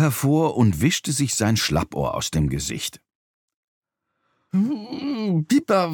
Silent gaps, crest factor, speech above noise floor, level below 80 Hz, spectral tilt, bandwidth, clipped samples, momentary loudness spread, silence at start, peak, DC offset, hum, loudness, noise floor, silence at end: 3.15-3.48 s, 3.54-3.82 s; 18 dB; 53 dB; -42 dBFS; -5 dB/octave; 19 kHz; under 0.1%; 8 LU; 0 s; -6 dBFS; under 0.1%; none; -22 LUFS; -74 dBFS; 0 s